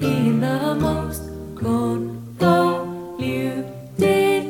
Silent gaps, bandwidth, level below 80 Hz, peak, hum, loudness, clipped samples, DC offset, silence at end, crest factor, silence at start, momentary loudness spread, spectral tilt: none; 17.5 kHz; -44 dBFS; -4 dBFS; none; -21 LUFS; under 0.1%; under 0.1%; 0 s; 16 dB; 0 s; 13 LU; -6.5 dB/octave